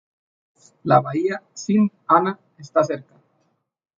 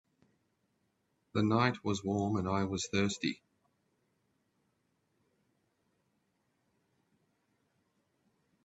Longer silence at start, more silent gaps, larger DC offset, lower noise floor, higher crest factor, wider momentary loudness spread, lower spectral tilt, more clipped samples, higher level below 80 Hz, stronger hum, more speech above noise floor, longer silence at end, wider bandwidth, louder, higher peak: second, 0.85 s vs 1.35 s; neither; neither; second, -69 dBFS vs -79 dBFS; about the same, 22 dB vs 26 dB; first, 13 LU vs 8 LU; first, -7 dB/octave vs -5.5 dB/octave; neither; about the same, -70 dBFS vs -72 dBFS; neither; about the same, 49 dB vs 46 dB; second, 0.95 s vs 5.3 s; second, 7.4 kHz vs 8.4 kHz; first, -21 LUFS vs -33 LUFS; first, -2 dBFS vs -14 dBFS